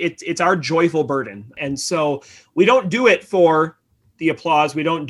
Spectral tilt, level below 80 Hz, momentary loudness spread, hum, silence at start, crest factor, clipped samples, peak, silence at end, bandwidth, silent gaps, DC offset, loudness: -5 dB/octave; -60 dBFS; 11 LU; none; 0 s; 16 dB; under 0.1%; -2 dBFS; 0 s; 12.5 kHz; none; under 0.1%; -18 LUFS